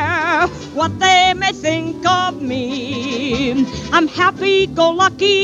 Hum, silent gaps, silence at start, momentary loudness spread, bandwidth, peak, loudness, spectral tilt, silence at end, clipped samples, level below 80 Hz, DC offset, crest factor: none; none; 0 s; 9 LU; 9.6 kHz; -2 dBFS; -16 LUFS; -4 dB/octave; 0 s; under 0.1%; -44 dBFS; under 0.1%; 14 dB